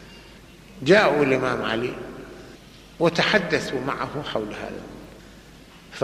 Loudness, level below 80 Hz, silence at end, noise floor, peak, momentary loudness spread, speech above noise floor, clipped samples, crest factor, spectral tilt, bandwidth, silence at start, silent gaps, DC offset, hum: -22 LUFS; -52 dBFS; 0 s; -47 dBFS; -4 dBFS; 25 LU; 25 dB; under 0.1%; 20 dB; -5 dB/octave; 14.5 kHz; 0 s; none; under 0.1%; none